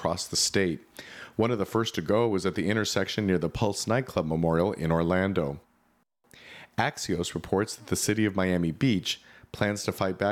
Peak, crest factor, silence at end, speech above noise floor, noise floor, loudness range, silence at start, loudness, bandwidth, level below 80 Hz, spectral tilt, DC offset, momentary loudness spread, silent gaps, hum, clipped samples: -10 dBFS; 18 dB; 0 s; 42 dB; -69 dBFS; 3 LU; 0 s; -27 LUFS; 16.5 kHz; -52 dBFS; -4.5 dB/octave; under 0.1%; 10 LU; none; none; under 0.1%